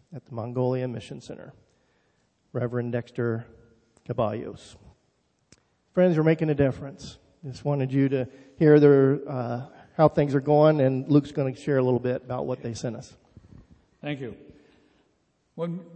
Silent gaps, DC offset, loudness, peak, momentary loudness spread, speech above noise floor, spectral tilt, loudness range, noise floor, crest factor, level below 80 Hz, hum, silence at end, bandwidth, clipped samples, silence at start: none; under 0.1%; -24 LUFS; -4 dBFS; 20 LU; 46 dB; -8.5 dB/octave; 12 LU; -70 dBFS; 22 dB; -60 dBFS; none; 0.1 s; 8.6 kHz; under 0.1%; 0.1 s